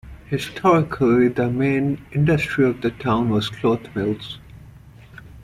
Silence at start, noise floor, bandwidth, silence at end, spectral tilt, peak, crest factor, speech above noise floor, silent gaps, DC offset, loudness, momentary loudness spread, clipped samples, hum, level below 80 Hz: 0.05 s; -44 dBFS; 14 kHz; 0.05 s; -7.5 dB/octave; -4 dBFS; 18 dB; 24 dB; none; under 0.1%; -20 LUFS; 9 LU; under 0.1%; none; -46 dBFS